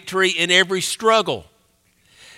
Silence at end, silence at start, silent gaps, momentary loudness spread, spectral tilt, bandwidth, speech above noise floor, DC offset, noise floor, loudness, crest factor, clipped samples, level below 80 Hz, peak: 0.95 s; 0.05 s; none; 9 LU; -2 dB/octave; 16 kHz; 42 dB; under 0.1%; -61 dBFS; -17 LUFS; 20 dB; under 0.1%; -62 dBFS; -2 dBFS